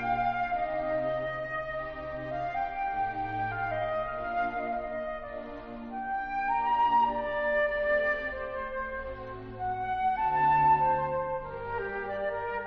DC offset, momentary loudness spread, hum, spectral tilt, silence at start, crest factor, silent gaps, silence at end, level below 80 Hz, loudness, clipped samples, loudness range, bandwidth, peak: under 0.1%; 12 LU; none; -3.5 dB/octave; 0 s; 16 dB; none; 0 s; -50 dBFS; -30 LUFS; under 0.1%; 4 LU; 5.8 kHz; -16 dBFS